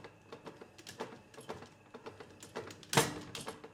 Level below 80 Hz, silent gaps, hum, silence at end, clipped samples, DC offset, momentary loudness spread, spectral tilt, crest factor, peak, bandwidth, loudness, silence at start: -70 dBFS; none; none; 0 s; under 0.1%; under 0.1%; 21 LU; -3 dB/octave; 30 dB; -12 dBFS; 17 kHz; -38 LUFS; 0 s